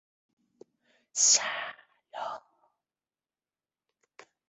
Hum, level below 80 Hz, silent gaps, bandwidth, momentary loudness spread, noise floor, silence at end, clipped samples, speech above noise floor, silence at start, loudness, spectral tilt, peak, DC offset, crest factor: none; -84 dBFS; none; 8.4 kHz; 22 LU; under -90 dBFS; 2.1 s; under 0.1%; over 61 dB; 1.15 s; -25 LUFS; 3 dB/octave; -10 dBFS; under 0.1%; 24 dB